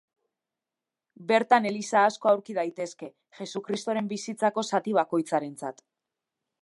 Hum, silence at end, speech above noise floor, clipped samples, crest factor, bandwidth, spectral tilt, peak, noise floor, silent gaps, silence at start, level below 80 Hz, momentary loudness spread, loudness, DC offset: none; 0.9 s; 63 dB; under 0.1%; 22 dB; 11.5 kHz; -4.5 dB/octave; -6 dBFS; -89 dBFS; none; 1.2 s; -82 dBFS; 16 LU; -27 LUFS; under 0.1%